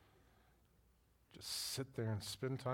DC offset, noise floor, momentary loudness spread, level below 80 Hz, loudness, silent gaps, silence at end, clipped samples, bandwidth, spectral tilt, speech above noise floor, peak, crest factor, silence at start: under 0.1%; -73 dBFS; 3 LU; -74 dBFS; -44 LUFS; none; 0 s; under 0.1%; 18 kHz; -4 dB/octave; 30 dB; -28 dBFS; 18 dB; 1.3 s